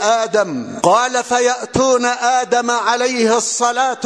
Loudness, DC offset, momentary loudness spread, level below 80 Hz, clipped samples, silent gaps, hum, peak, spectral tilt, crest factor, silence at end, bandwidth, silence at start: -15 LUFS; under 0.1%; 3 LU; -50 dBFS; under 0.1%; none; none; 0 dBFS; -2.5 dB/octave; 16 dB; 0 s; 11 kHz; 0 s